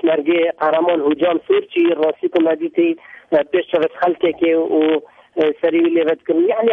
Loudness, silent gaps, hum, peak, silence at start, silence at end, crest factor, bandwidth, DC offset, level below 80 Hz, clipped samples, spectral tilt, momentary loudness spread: -17 LUFS; none; none; -4 dBFS; 0.05 s; 0 s; 12 dB; 3.9 kHz; under 0.1%; -64 dBFS; under 0.1%; -7.5 dB/octave; 4 LU